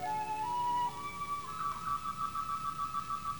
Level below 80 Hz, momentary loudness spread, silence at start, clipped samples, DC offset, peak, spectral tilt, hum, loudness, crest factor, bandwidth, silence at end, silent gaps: -60 dBFS; 5 LU; 0 s; under 0.1%; 0.2%; -24 dBFS; -3.5 dB/octave; none; -36 LUFS; 12 dB; over 20 kHz; 0 s; none